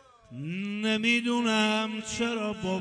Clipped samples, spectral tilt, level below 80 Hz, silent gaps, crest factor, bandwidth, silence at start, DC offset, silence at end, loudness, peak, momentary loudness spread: under 0.1%; -4 dB/octave; -62 dBFS; none; 16 dB; 10 kHz; 0.3 s; under 0.1%; 0 s; -27 LUFS; -12 dBFS; 11 LU